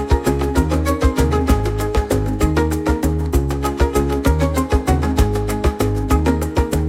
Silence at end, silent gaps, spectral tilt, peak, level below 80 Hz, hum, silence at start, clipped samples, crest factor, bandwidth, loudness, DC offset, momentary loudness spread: 0 s; none; -6.5 dB/octave; -2 dBFS; -22 dBFS; none; 0 s; under 0.1%; 14 dB; 16 kHz; -18 LUFS; under 0.1%; 2 LU